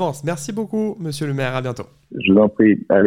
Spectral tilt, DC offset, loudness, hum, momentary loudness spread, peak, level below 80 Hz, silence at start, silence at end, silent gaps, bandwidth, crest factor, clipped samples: -6.5 dB/octave; under 0.1%; -19 LUFS; none; 12 LU; -2 dBFS; -56 dBFS; 0 s; 0 s; none; 15.5 kHz; 16 dB; under 0.1%